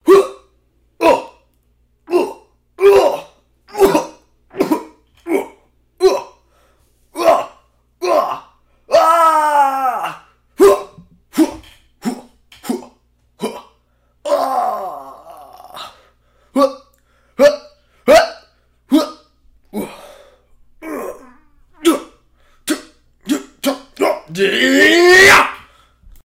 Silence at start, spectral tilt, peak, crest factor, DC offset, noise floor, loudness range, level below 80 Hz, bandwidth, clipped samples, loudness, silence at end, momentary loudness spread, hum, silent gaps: 0.05 s; -3 dB/octave; 0 dBFS; 16 dB; under 0.1%; -58 dBFS; 10 LU; -50 dBFS; 16 kHz; under 0.1%; -14 LUFS; 0.65 s; 22 LU; 60 Hz at -55 dBFS; none